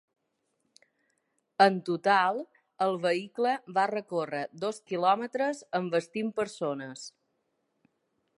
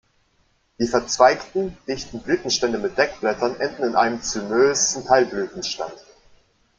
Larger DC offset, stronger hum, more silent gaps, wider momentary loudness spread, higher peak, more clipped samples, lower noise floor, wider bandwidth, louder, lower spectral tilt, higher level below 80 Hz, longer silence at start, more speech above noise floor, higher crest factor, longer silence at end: neither; neither; neither; first, 14 LU vs 11 LU; second, -8 dBFS vs 0 dBFS; neither; first, -78 dBFS vs -64 dBFS; first, 11.5 kHz vs 9.4 kHz; second, -29 LUFS vs -21 LUFS; first, -5 dB/octave vs -2.5 dB/octave; second, -82 dBFS vs -52 dBFS; first, 1.6 s vs 0.8 s; first, 49 dB vs 43 dB; about the same, 22 dB vs 22 dB; first, 1.3 s vs 0.8 s